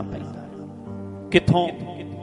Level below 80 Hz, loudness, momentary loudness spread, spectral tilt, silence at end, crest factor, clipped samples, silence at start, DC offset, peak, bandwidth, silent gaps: -48 dBFS; -23 LUFS; 18 LU; -7 dB/octave; 0 s; 24 dB; under 0.1%; 0 s; under 0.1%; -2 dBFS; 11 kHz; none